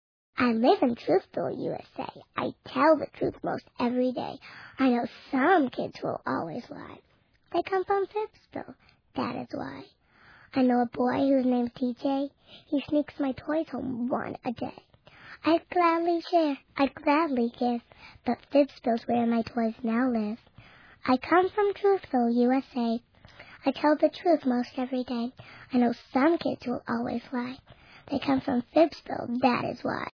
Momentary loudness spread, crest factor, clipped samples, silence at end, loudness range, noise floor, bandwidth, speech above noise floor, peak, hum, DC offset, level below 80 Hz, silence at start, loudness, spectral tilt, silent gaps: 13 LU; 18 dB; under 0.1%; 0.05 s; 5 LU; -57 dBFS; 5.4 kHz; 29 dB; -10 dBFS; none; under 0.1%; -64 dBFS; 0.35 s; -28 LUFS; -7.5 dB/octave; none